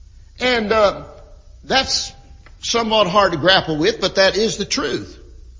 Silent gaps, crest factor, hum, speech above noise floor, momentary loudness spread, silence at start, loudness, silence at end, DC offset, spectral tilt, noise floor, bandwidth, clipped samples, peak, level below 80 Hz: none; 18 dB; none; 25 dB; 12 LU; 0.35 s; -17 LUFS; 0 s; under 0.1%; -3 dB/octave; -42 dBFS; 7.6 kHz; under 0.1%; 0 dBFS; -42 dBFS